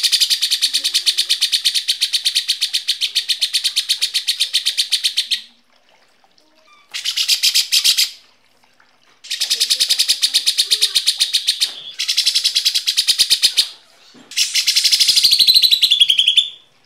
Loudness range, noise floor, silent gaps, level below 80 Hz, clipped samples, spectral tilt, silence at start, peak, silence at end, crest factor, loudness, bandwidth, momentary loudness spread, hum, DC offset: 6 LU; -56 dBFS; none; -60 dBFS; under 0.1%; 4.5 dB/octave; 0 s; -2 dBFS; 0.3 s; 16 dB; -14 LUFS; 16.5 kHz; 8 LU; none; 0.1%